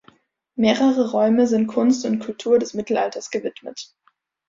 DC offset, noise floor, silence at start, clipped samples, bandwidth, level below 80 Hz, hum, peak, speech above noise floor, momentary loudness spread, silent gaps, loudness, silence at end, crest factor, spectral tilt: under 0.1%; -56 dBFS; 0.55 s; under 0.1%; 7.6 kHz; -64 dBFS; none; -4 dBFS; 36 dB; 18 LU; none; -20 LUFS; 0.65 s; 18 dB; -5 dB/octave